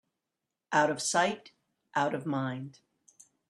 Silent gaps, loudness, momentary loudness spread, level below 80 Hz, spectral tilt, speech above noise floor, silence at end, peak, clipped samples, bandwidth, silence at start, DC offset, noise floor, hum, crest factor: none; -30 LUFS; 14 LU; -78 dBFS; -3.5 dB/octave; 58 dB; 0.8 s; -12 dBFS; under 0.1%; 13 kHz; 0.7 s; under 0.1%; -88 dBFS; none; 22 dB